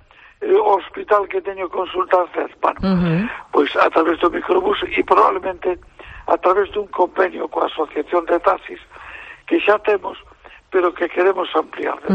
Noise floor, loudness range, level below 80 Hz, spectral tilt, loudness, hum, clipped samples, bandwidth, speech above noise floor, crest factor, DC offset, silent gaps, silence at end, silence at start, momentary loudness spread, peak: -37 dBFS; 3 LU; -48 dBFS; -7.5 dB/octave; -18 LUFS; none; under 0.1%; 7.4 kHz; 19 dB; 16 dB; under 0.1%; none; 0 s; 0.4 s; 9 LU; -2 dBFS